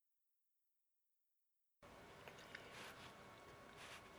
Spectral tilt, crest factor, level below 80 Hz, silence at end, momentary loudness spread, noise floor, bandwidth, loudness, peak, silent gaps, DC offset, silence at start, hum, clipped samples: -3 dB/octave; 26 dB; -80 dBFS; 0 s; 7 LU; -87 dBFS; over 20 kHz; -58 LUFS; -36 dBFS; none; under 0.1%; 1.8 s; none; under 0.1%